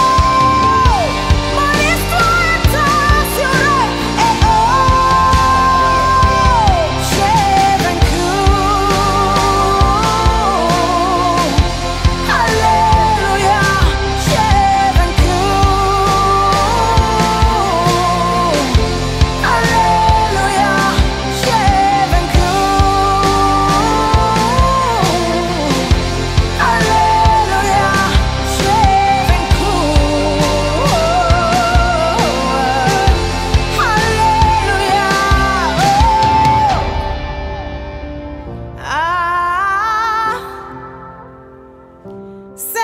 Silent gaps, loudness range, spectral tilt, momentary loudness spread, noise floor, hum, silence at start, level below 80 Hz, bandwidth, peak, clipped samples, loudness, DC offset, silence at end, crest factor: none; 4 LU; -4.5 dB/octave; 5 LU; -39 dBFS; none; 0 s; -20 dBFS; 16 kHz; 0 dBFS; under 0.1%; -12 LUFS; under 0.1%; 0 s; 12 dB